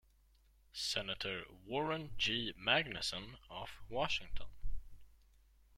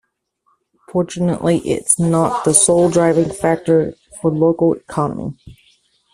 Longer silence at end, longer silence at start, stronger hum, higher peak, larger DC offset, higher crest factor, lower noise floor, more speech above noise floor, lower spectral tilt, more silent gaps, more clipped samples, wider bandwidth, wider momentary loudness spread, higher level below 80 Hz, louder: about the same, 0.7 s vs 0.6 s; second, 0.75 s vs 0.9 s; neither; second, -16 dBFS vs 0 dBFS; neither; first, 24 dB vs 18 dB; first, -69 dBFS vs -65 dBFS; second, 30 dB vs 49 dB; second, -3 dB/octave vs -5 dB/octave; neither; neither; about the same, 14.5 kHz vs 14 kHz; first, 18 LU vs 10 LU; about the same, -52 dBFS vs -50 dBFS; second, -38 LUFS vs -16 LUFS